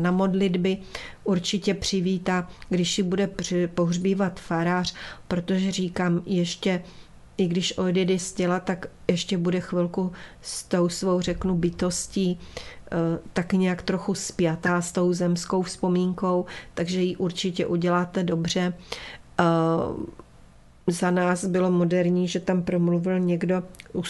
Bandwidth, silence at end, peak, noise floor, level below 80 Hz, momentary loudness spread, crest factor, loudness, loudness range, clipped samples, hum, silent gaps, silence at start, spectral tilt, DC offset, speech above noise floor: 12 kHz; 0 s; -6 dBFS; -51 dBFS; -50 dBFS; 8 LU; 20 dB; -25 LUFS; 2 LU; under 0.1%; none; none; 0 s; -5.5 dB/octave; under 0.1%; 26 dB